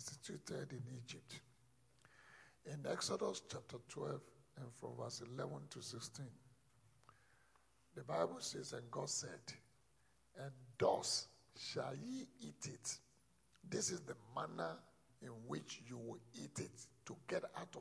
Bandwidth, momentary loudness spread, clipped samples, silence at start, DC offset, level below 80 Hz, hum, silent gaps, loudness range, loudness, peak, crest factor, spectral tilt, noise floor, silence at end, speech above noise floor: 11 kHz; 16 LU; under 0.1%; 0 s; under 0.1%; -82 dBFS; none; none; 7 LU; -47 LUFS; -24 dBFS; 24 dB; -3.5 dB/octave; -77 dBFS; 0 s; 30 dB